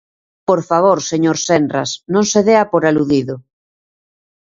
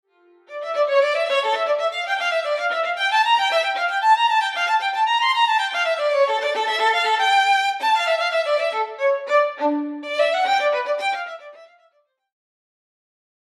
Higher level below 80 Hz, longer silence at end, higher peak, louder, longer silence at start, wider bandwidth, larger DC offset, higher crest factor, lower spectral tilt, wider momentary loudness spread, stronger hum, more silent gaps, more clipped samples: first, -54 dBFS vs under -90 dBFS; second, 1.15 s vs 1.85 s; first, 0 dBFS vs -6 dBFS; first, -15 LUFS vs -20 LUFS; about the same, 0.5 s vs 0.5 s; second, 7.8 kHz vs 13.5 kHz; neither; about the same, 16 dB vs 14 dB; first, -4.5 dB/octave vs 1 dB/octave; about the same, 8 LU vs 6 LU; neither; neither; neither